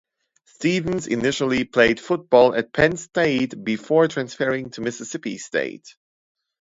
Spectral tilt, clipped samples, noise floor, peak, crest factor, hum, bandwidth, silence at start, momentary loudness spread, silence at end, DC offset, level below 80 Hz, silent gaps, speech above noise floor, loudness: -5 dB/octave; under 0.1%; -61 dBFS; -2 dBFS; 20 dB; none; 7.8 kHz; 0.6 s; 12 LU; 0.85 s; under 0.1%; -52 dBFS; none; 40 dB; -21 LUFS